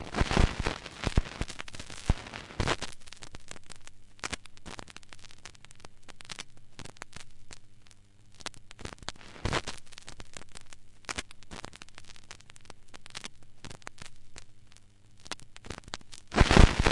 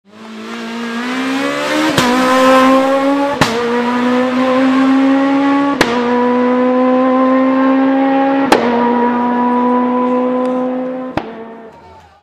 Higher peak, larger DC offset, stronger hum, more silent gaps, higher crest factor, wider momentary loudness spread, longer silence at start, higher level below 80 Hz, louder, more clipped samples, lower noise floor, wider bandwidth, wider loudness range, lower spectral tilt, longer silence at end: about the same, -2 dBFS vs 0 dBFS; neither; neither; neither; first, 32 dB vs 12 dB; first, 23 LU vs 11 LU; second, 0 s vs 0.15 s; first, -36 dBFS vs -48 dBFS; second, -32 LUFS vs -13 LUFS; neither; first, -52 dBFS vs -39 dBFS; second, 11.5 kHz vs 14.5 kHz; first, 14 LU vs 2 LU; about the same, -4.5 dB/octave vs -5 dB/octave; second, 0 s vs 0.25 s